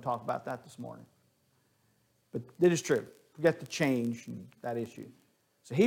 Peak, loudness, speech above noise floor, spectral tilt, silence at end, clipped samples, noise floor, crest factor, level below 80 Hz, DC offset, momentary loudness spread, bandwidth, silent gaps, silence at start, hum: -12 dBFS; -33 LUFS; 39 dB; -5.5 dB/octave; 0 s; under 0.1%; -72 dBFS; 20 dB; -76 dBFS; under 0.1%; 19 LU; 16.5 kHz; none; 0 s; none